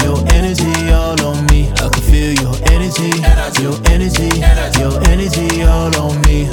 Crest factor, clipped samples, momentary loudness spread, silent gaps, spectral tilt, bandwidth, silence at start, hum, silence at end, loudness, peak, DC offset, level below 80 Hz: 10 dB; under 0.1%; 2 LU; none; -5 dB/octave; 18 kHz; 0 s; none; 0 s; -13 LUFS; 0 dBFS; under 0.1%; -14 dBFS